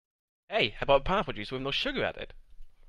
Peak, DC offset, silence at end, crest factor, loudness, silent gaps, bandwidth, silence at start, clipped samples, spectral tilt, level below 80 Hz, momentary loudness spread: -10 dBFS; under 0.1%; 0.15 s; 22 dB; -29 LUFS; none; 11 kHz; 0.5 s; under 0.1%; -5.5 dB/octave; -44 dBFS; 10 LU